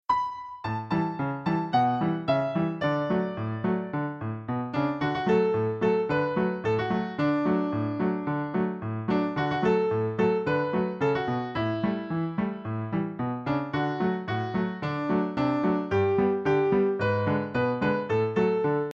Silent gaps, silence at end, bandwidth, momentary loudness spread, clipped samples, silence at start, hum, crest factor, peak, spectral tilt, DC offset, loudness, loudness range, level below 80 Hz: none; 0 s; 7.4 kHz; 6 LU; under 0.1%; 0.1 s; none; 14 dB; -12 dBFS; -8.5 dB/octave; under 0.1%; -27 LUFS; 4 LU; -58 dBFS